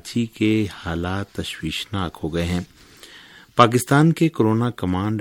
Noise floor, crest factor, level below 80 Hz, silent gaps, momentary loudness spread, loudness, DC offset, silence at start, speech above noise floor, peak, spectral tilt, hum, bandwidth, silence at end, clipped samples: -46 dBFS; 22 dB; -46 dBFS; none; 11 LU; -21 LUFS; under 0.1%; 0.05 s; 25 dB; 0 dBFS; -6 dB/octave; none; 17 kHz; 0 s; under 0.1%